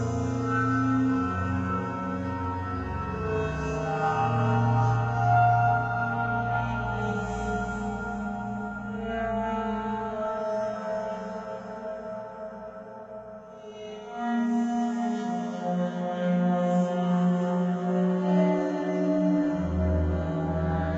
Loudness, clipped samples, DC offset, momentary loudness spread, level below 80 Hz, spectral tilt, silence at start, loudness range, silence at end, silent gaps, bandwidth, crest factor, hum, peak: -28 LUFS; under 0.1%; under 0.1%; 13 LU; -46 dBFS; -8 dB/octave; 0 s; 8 LU; 0 s; none; 8 kHz; 16 dB; none; -12 dBFS